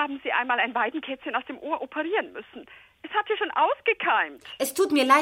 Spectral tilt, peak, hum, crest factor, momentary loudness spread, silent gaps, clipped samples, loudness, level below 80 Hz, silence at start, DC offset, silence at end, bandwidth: -1.5 dB/octave; -4 dBFS; none; 22 dB; 12 LU; none; under 0.1%; -26 LUFS; -70 dBFS; 0 s; under 0.1%; 0 s; 16 kHz